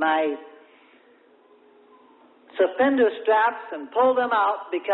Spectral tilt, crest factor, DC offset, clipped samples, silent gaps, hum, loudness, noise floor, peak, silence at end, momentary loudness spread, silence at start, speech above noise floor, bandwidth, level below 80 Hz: -8 dB/octave; 16 dB; under 0.1%; under 0.1%; none; none; -22 LUFS; -56 dBFS; -8 dBFS; 0 s; 11 LU; 0 s; 34 dB; 4.2 kHz; -74 dBFS